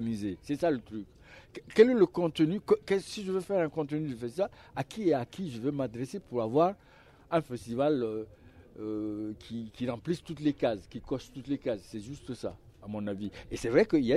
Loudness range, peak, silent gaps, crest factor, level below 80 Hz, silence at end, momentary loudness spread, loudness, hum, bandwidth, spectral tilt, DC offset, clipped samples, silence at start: 7 LU; -8 dBFS; none; 22 dB; -60 dBFS; 0 s; 15 LU; -31 LUFS; none; 13 kHz; -6.5 dB/octave; under 0.1%; under 0.1%; 0 s